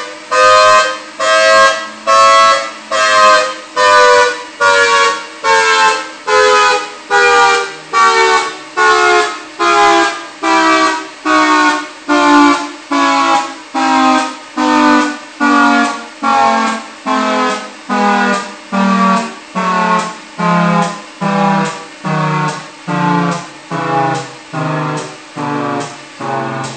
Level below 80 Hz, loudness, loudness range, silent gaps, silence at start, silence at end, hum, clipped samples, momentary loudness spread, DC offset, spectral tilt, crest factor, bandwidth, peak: -54 dBFS; -11 LUFS; 7 LU; none; 0 s; 0 s; none; 0.2%; 12 LU; under 0.1%; -3.5 dB/octave; 12 dB; 9.2 kHz; 0 dBFS